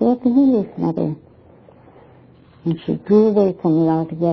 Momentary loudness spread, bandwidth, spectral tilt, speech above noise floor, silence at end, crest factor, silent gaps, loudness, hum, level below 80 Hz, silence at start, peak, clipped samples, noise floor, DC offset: 11 LU; 5.4 kHz; -11 dB/octave; 31 dB; 0 s; 16 dB; none; -18 LUFS; none; -56 dBFS; 0 s; -4 dBFS; under 0.1%; -47 dBFS; under 0.1%